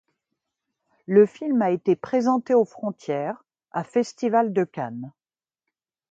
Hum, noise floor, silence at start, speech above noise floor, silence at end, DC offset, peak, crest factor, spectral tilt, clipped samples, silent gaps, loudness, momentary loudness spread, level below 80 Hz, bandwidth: none; -85 dBFS; 1.1 s; 63 dB; 1.05 s; under 0.1%; -4 dBFS; 20 dB; -7.5 dB/octave; under 0.1%; none; -23 LUFS; 14 LU; -72 dBFS; 7.8 kHz